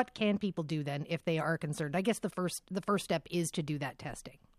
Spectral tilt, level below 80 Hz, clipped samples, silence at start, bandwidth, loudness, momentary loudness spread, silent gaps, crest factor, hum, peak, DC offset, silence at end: -5.5 dB/octave; -64 dBFS; under 0.1%; 0 s; 15 kHz; -35 LUFS; 6 LU; none; 18 dB; none; -18 dBFS; under 0.1%; 0.25 s